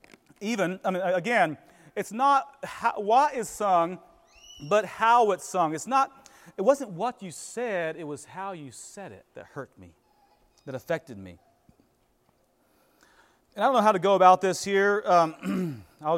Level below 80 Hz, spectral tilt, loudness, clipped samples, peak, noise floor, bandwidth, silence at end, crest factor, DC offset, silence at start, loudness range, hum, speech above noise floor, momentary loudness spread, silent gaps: -70 dBFS; -4.5 dB/octave; -25 LUFS; under 0.1%; -4 dBFS; -68 dBFS; 16 kHz; 0 s; 22 dB; under 0.1%; 0.4 s; 17 LU; none; 42 dB; 20 LU; none